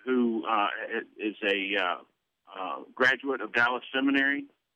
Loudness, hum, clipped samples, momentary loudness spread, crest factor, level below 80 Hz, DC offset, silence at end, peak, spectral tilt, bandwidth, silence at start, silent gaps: -28 LUFS; none; under 0.1%; 12 LU; 18 dB; -78 dBFS; under 0.1%; 0.3 s; -12 dBFS; -4.5 dB/octave; 9.2 kHz; 0.05 s; none